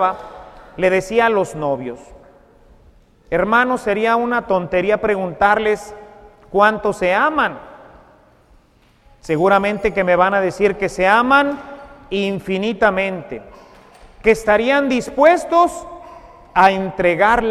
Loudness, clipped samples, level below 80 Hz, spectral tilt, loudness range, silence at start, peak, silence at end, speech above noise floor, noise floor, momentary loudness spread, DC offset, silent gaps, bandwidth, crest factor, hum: -16 LUFS; under 0.1%; -44 dBFS; -5.5 dB/octave; 4 LU; 0 s; 0 dBFS; 0 s; 37 dB; -53 dBFS; 17 LU; under 0.1%; none; 14 kHz; 18 dB; none